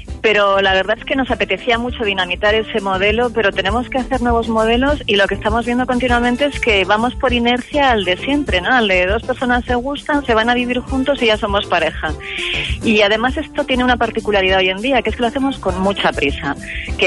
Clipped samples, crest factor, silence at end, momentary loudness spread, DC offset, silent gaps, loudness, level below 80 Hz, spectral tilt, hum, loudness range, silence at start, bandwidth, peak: under 0.1%; 12 dB; 0 s; 6 LU; under 0.1%; none; -16 LUFS; -30 dBFS; -5 dB/octave; none; 2 LU; 0 s; 11.5 kHz; -4 dBFS